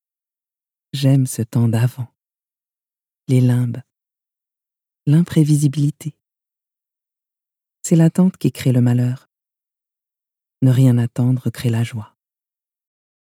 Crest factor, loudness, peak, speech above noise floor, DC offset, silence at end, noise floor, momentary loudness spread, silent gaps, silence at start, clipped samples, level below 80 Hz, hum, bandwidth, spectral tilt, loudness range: 16 dB; -17 LUFS; -2 dBFS; over 74 dB; under 0.1%; 1.35 s; under -90 dBFS; 17 LU; none; 0.95 s; under 0.1%; -62 dBFS; none; 15.5 kHz; -7.5 dB/octave; 3 LU